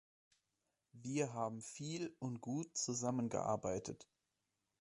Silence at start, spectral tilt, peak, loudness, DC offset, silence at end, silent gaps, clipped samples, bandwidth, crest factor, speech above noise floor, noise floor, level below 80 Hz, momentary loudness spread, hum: 0.95 s; -5 dB/octave; -24 dBFS; -42 LUFS; under 0.1%; 0.75 s; none; under 0.1%; 11.5 kHz; 20 dB; 46 dB; -88 dBFS; -74 dBFS; 8 LU; none